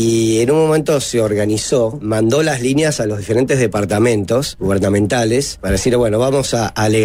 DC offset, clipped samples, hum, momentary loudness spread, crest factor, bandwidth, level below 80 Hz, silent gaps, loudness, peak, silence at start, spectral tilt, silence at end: under 0.1%; under 0.1%; none; 4 LU; 12 dB; 16 kHz; -36 dBFS; none; -15 LUFS; -4 dBFS; 0 s; -5 dB/octave; 0 s